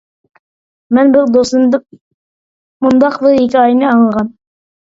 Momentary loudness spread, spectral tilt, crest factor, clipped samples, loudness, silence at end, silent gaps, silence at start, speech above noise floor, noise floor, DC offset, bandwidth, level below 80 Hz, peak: 8 LU; -6 dB/octave; 12 dB; under 0.1%; -11 LUFS; 0.55 s; 2.01-2.80 s; 0.9 s; over 80 dB; under -90 dBFS; under 0.1%; 7.8 kHz; -52 dBFS; 0 dBFS